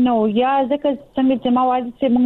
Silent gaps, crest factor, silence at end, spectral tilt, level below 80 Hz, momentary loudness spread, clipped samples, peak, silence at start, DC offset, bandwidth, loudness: none; 10 dB; 0 s; -8.5 dB/octave; -54 dBFS; 4 LU; under 0.1%; -8 dBFS; 0 s; under 0.1%; 4.1 kHz; -18 LUFS